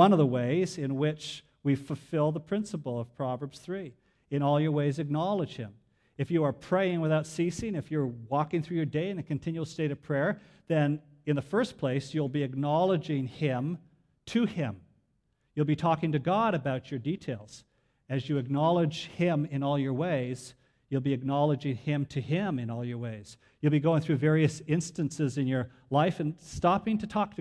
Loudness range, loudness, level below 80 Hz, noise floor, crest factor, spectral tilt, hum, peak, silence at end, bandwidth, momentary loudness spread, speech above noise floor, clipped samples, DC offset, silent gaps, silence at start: 3 LU; -30 LUFS; -62 dBFS; -74 dBFS; 22 dB; -7 dB/octave; none; -8 dBFS; 0.05 s; 11 kHz; 10 LU; 45 dB; under 0.1%; under 0.1%; none; 0 s